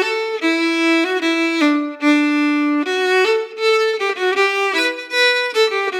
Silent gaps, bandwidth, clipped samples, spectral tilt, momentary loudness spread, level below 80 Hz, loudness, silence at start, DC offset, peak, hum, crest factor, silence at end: none; 15.5 kHz; under 0.1%; -1 dB/octave; 4 LU; under -90 dBFS; -16 LUFS; 0 s; under 0.1%; -4 dBFS; none; 14 dB; 0 s